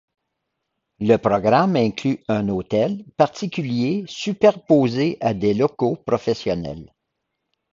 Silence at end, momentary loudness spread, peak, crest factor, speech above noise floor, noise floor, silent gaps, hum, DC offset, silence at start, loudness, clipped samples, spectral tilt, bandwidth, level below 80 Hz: 0.9 s; 9 LU; 0 dBFS; 20 dB; 58 dB; -78 dBFS; none; none; under 0.1%; 1 s; -20 LUFS; under 0.1%; -7 dB/octave; 7.6 kHz; -52 dBFS